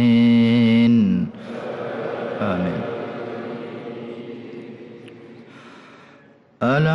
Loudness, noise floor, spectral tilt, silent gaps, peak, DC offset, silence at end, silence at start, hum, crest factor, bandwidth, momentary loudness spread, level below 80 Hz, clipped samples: -20 LUFS; -50 dBFS; -8.5 dB/octave; none; -8 dBFS; under 0.1%; 0 s; 0 s; none; 12 dB; 6 kHz; 22 LU; -60 dBFS; under 0.1%